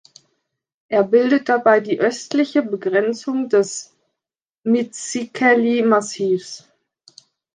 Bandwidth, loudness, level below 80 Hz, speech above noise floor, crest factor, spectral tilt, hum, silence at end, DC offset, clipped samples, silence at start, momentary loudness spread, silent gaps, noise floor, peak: 9.8 kHz; -18 LUFS; -72 dBFS; 69 dB; 16 dB; -4.5 dB/octave; none; 0.95 s; under 0.1%; under 0.1%; 0.9 s; 10 LU; 4.58-4.63 s; -87 dBFS; -2 dBFS